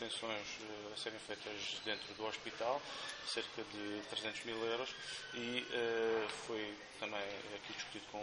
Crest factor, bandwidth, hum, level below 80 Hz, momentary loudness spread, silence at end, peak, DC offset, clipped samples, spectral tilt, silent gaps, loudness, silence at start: 22 dB; 10 kHz; none; -76 dBFS; 8 LU; 0 s; -22 dBFS; under 0.1%; under 0.1%; -2.5 dB/octave; none; -42 LUFS; 0 s